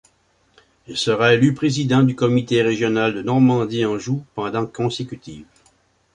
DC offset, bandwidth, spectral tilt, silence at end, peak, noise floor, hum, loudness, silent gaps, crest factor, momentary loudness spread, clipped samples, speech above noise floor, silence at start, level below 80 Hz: under 0.1%; 10.5 kHz; -6 dB/octave; 0.7 s; -2 dBFS; -61 dBFS; none; -19 LUFS; none; 18 dB; 11 LU; under 0.1%; 43 dB; 0.9 s; -56 dBFS